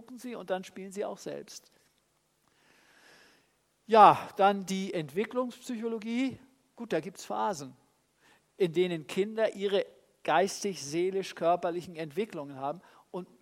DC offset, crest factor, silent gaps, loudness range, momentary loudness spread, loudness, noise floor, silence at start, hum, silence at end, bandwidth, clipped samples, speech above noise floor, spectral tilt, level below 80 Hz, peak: under 0.1%; 26 dB; none; 9 LU; 16 LU; -30 LUFS; -73 dBFS; 0.1 s; none; 0.15 s; 16 kHz; under 0.1%; 43 dB; -5 dB/octave; -78 dBFS; -6 dBFS